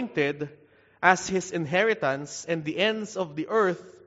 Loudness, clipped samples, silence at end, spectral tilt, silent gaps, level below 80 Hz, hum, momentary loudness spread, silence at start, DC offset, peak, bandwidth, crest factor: -26 LUFS; under 0.1%; 0.15 s; -3 dB/octave; none; -68 dBFS; none; 10 LU; 0 s; under 0.1%; -2 dBFS; 8 kHz; 24 dB